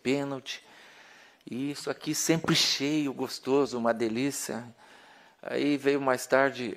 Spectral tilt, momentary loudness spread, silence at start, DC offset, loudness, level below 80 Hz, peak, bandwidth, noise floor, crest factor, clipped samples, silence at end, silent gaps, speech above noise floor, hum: -3.5 dB/octave; 14 LU; 0.05 s; under 0.1%; -28 LUFS; -70 dBFS; -8 dBFS; 16 kHz; -56 dBFS; 22 dB; under 0.1%; 0 s; none; 27 dB; none